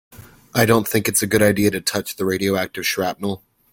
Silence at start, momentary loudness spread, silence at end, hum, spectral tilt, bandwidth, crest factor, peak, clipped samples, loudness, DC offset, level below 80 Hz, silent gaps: 0.15 s; 9 LU; 0.35 s; none; -4 dB/octave; 17 kHz; 20 dB; 0 dBFS; under 0.1%; -19 LUFS; under 0.1%; -52 dBFS; none